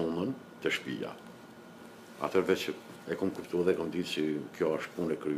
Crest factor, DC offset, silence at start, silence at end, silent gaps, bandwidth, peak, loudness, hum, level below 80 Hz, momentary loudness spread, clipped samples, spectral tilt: 20 dB; under 0.1%; 0 s; 0 s; none; 15.5 kHz; -14 dBFS; -33 LUFS; none; -70 dBFS; 20 LU; under 0.1%; -5.5 dB/octave